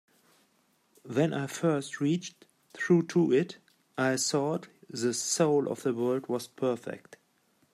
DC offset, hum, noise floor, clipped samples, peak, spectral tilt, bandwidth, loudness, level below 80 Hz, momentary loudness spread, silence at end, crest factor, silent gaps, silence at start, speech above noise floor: under 0.1%; none; -70 dBFS; under 0.1%; -12 dBFS; -5 dB/octave; 14.5 kHz; -29 LUFS; -78 dBFS; 13 LU; 0.75 s; 18 dB; none; 1.05 s; 41 dB